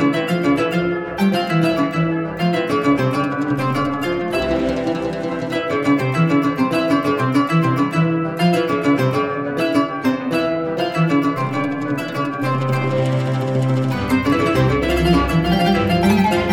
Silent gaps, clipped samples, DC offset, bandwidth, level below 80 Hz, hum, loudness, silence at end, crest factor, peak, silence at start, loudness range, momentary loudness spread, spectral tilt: none; under 0.1%; under 0.1%; 17 kHz; -38 dBFS; none; -18 LUFS; 0 s; 14 dB; -4 dBFS; 0 s; 2 LU; 5 LU; -7 dB/octave